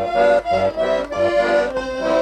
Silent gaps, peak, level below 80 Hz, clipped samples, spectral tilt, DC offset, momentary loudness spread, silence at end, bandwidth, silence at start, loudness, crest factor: none; -6 dBFS; -44 dBFS; under 0.1%; -5 dB/octave; under 0.1%; 5 LU; 0 s; 9.8 kHz; 0 s; -18 LUFS; 12 dB